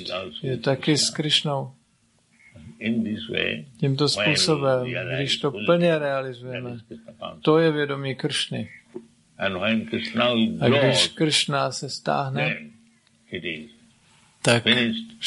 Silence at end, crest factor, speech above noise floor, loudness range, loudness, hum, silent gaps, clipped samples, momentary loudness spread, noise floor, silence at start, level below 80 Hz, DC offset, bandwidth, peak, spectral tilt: 0 s; 22 dB; 40 dB; 4 LU; -23 LUFS; none; none; under 0.1%; 14 LU; -64 dBFS; 0 s; -60 dBFS; under 0.1%; 11.5 kHz; -2 dBFS; -4 dB/octave